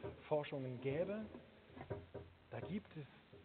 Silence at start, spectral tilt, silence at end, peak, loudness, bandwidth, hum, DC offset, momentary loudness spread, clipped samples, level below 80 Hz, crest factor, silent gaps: 0 s; -6.5 dB/octave; 0 s; -26 dBFS; -46 LUFS; 4.5 kHz; none; under 0.1%; 16 LU; under 0.1%; -72 dBFS; 20 dB; none